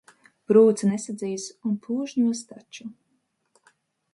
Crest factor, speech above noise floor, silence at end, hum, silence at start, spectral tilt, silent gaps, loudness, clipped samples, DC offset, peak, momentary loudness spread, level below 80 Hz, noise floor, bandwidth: 20 dB; 49 dB; 1.2 s; none; 0.5 s; -6 dB/octave; none; -23 LUFS; under 0.1%; under 0.1%; -6 dBFS; 23 LU; -74 dBFS; -72 dBFS; 11.5 kHz